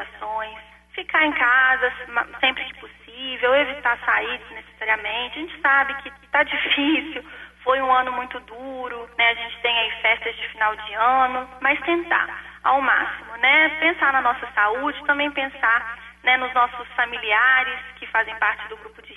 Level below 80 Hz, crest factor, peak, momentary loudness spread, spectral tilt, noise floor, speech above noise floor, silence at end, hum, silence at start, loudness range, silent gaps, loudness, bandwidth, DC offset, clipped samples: -54 dBFS; 18 dB; -4 dBFS; 16 LU; -4 dB/octave; -42 dBFS; 20 dB; 0 s; 60 Hz at -55 dBFS; 0 s; 3 LU; none; -20 LUFS; 11.5 kHz; under 0.1%; under 0.1%